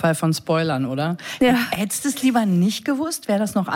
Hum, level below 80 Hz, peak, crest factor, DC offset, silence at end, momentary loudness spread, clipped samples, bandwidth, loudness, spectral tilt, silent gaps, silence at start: none; -56 dBFS; -8 dBFS; 12 dB; under 0.1%; 0 s; 5 LU; under 0.1%; 17 kHz; -21 LUFS; -5 dB/octave; none; 0 s